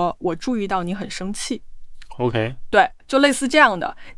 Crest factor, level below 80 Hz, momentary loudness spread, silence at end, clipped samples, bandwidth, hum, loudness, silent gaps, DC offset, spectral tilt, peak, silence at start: 20 dB; -44 dBFS; 13 LU; 0.05 s; under 0.1%; 12 kHz; none; -20 LUFS; none; under 0.1%; -4 dB/octave; -2 dBFS; 0 s